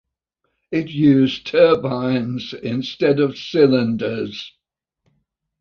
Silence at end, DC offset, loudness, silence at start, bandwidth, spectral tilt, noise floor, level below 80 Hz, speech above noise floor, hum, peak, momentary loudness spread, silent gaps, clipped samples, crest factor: 1.1 s; under 0.1%; -18 LUFS; 0.7 s; 6.8 kHz; -7.5 dB/octave; -74 dBFS; -58 dBFS; 56 dB; none; -2 dBFS; 12 LU; none; under 0.1%; 18 dB